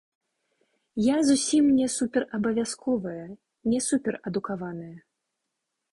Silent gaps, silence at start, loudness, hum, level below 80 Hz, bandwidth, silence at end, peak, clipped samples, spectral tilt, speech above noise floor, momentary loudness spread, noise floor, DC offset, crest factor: none; 0.95 s; -26 LUFS; none; -62 dBFS; 11.5 kHz; 0.95 s; -10 dBFS; under 0.1%; -4.5 dB/octave; 57 dB; 16 LU; -82 dBFS; under 0.1%; 16 dB